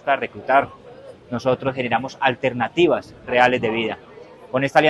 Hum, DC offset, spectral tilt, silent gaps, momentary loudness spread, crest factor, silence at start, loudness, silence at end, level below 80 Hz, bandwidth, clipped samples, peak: none; under 0.1%; -6 dB/octave; none; 10 LU; 20 dB; 0.05 s; -21 LUFS; 0 s; -56 dBFS; 12 kHz; under 0.1%; 0 dBFS